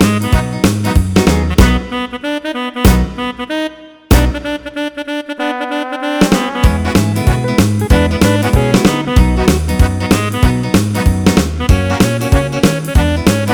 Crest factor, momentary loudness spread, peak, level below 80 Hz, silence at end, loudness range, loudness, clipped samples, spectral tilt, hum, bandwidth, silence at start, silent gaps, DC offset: 12 dB; 8 LU; 0 dBFS; -18 dBFS; 0 s; 4 LU; -13 LUFS; 0.4%; -5.5 dB/octave; none; over 20 kHz; 0 s; none; under 0.1%